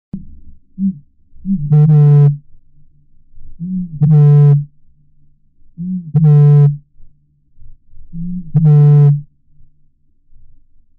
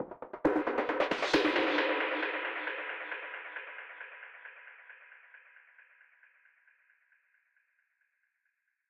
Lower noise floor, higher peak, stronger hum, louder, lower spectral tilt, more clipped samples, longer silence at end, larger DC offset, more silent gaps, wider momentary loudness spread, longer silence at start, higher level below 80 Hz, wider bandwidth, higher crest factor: second, -50 dBFS vs -81 dBFS; first, -4 dBFS vs -14 dBFS; neither; first, -11 LUFS vs -32 LUFS; first, -13 dB/octave vs -4 dB/octave; neither; second, 1.75 s vs 3.1 s; neither; neither; about the same, 21 LU vs 23 LU; first, 0.15 s vs 0 s; first, -38 dBFS vs -68 dBFS; second, 2 kHz vs 10.5 kHz; second, 10 dB vs 22 dB